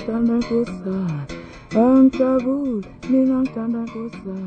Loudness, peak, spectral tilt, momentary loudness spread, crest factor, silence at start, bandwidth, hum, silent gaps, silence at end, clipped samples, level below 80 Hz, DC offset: -20 LUFS; -6 dBFS; -8.5 dB/octave; 15 LU; 14 dB; 0 s; 7.8 kHz; none; none; 0 s; under 0.1%; -48 dBFS; under 0.1%